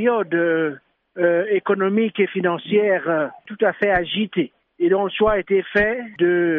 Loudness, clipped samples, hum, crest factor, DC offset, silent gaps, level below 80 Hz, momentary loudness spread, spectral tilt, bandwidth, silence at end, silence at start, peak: -20 LUFS; under 0.1%; none; 14 dB; under 0.1%; none; -48 dBFS; 6 LU; -4 dB/octave; 4.1 kHz; 0 s; 0 s; -6 dBFS